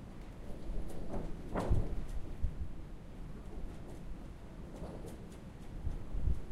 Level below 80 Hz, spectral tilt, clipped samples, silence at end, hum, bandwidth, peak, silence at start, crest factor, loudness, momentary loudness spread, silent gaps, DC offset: -42 dBFS; -7.5 dB/octave; under 0.1%; 0 s; none; 11.5 kHz; -18 dBFS; 0 s; 20 dB; -44 LUFS; 13 LU; none; under 0.1%